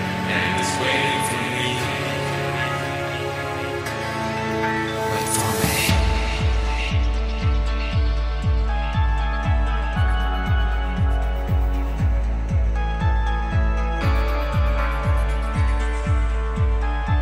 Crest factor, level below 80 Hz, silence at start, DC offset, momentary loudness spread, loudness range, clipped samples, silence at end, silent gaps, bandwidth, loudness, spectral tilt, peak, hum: 14 dB; -24 dBFS; 0 s; under 0.1%; 4 LU; 2 LU; under 0.1%; 0 s; none; 15.5 kHz; -22 LUFS; -5 dB/octave; -6 dBFS; none